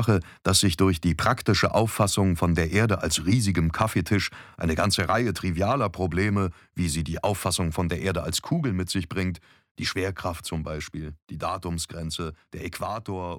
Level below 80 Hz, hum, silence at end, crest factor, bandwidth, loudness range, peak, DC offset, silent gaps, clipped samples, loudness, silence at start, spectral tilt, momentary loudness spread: -42 dBFS; none; 0 s; 20 dB; 18 kHz; 8 LU; -6 dBFS; under 0.1%; 9.71-9.75 s; under 0.1%; -25 LUFS; 0 s; -5 dB/octave; 10 LU